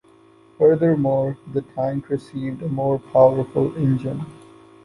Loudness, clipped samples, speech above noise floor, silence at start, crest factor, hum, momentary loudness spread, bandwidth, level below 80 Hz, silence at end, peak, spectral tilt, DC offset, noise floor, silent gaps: -21 LUFS; under 0.1%; 32 dB; 0.6 s; 18 dB; none; 12 LU; 11 kHz; -54 dBFS; 0.5 s; -2 dBFS; -10 dB/octave; under 0.1%; -52 dBFS; none